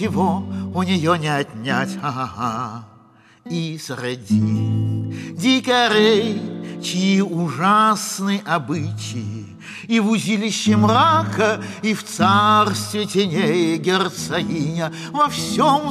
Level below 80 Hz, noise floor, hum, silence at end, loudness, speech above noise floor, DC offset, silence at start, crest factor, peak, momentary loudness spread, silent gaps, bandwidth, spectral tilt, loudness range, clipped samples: -58 dBFS; -50 dBFS; none; 0 s; -19 LUFS; 31 dB; under 0.1%; 0 s; 16 dB; -4 dBFS; 12 LU; none; 14.5 kHz; -5 dB/octave; 7 LU; under 0.1%